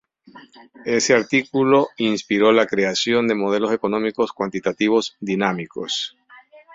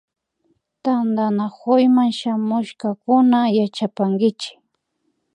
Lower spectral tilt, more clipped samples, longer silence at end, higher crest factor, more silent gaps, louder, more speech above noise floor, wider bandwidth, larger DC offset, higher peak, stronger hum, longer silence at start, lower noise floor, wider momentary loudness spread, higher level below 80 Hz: second, -4 dB/octave vs -7 dB/octave; neither; second, 0 s vs 0.85 s; about the same, 18 dB vs 16 dB; neither; about the same, -20 LUFS vs -19 LUFS; second, 28 dB vs 53 dB; second, 7.8 kHz vs 9.8 kHz; neither; about the same, -2 dBFS vs -4 dBFS; neither; second, 0.35 s vs 0.85 s; second, -48 dBFS vs -71 dBFS; second, 8 LU vs 11 LU; first, -62 dBFS vs -74 dBFS